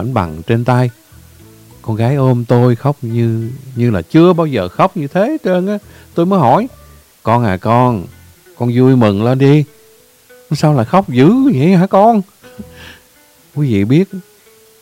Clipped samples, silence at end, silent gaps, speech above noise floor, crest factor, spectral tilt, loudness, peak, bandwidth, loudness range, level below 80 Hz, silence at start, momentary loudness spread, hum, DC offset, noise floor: 0.2%; 0.6 s; none; 35 dB; 12 dB; -8.5 dB/octave; -13 LUFS; 0 dBFS; 16 kHz; 3 LU; -48 dBFS; 0 s; 13 LU; none; under 0.1%; -47 dBFS